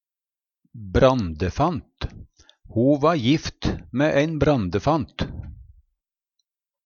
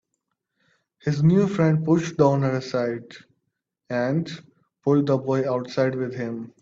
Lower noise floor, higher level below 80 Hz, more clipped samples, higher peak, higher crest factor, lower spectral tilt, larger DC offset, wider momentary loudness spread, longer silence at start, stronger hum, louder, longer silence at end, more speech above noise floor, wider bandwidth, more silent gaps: first, under -90 dBFS vs -79 dBFS; first, -40 dBFS vs -62 dBFS; neither; about the same, -4 dBFS vs -6 dBFS; about the same, 20 dB vs 18 dB; about the same, -7 dB/octave vs -8 dB/octave; neither; first, 17 LU vs 12 LU; second, 0.75 s vs 1.05 s; neither; about the same, -22 LUFS vs -23 LUFS; first, 1.25 s vs 0.15 s; first, over 69 dB vs 57 dB; about the same, 7.2 kHz vs 7.6 kHz; neither